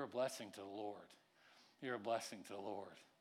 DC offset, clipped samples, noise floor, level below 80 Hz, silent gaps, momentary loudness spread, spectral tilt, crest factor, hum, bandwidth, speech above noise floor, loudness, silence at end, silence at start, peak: under 0.1%; under 0.1%; -70 dBFS; under -90 dBFS; none; 23 LU; -3.5 dB/octave; 18 dB; none; 17.5 kHz; 23 dB; -47 LUFS; 0.15 s; 0 s; -30 dBFS